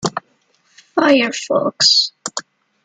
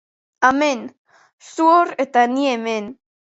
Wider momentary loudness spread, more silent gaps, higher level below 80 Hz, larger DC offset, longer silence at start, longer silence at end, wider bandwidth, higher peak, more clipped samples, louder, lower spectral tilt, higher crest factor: about the same, 16 LU vs 17 LU; second, none vs 0.98-1.05 s, 1.33-1.38 s; about the same, -64 dBFS vs -64 dBFS; neither; second, 0 s vs 0.4 s; about the same, 0.45 s vs 0.4 s; first, 11.5 kHz vs 8 kHz; about the same, -2 dBFS vs 0 dBFS; neither; first, -15 LUFS vs -18 LUFS; about the same, -2.5 dB/octave vs -3.5 dB/octave; about the same, 16 dB vs 18 dB